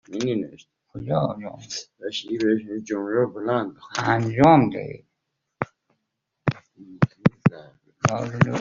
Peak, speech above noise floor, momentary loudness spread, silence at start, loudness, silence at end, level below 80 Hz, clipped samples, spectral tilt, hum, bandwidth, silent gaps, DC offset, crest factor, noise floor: -2 dBFS; 56 dB; 16 LU; 0.1 s; -24 LUFS; 0 s; -56 dBFS; under 0.1%; -6 dB/octave; none; 7.6 kHz; none; under 0.1%; 22 dB; -79 dBFS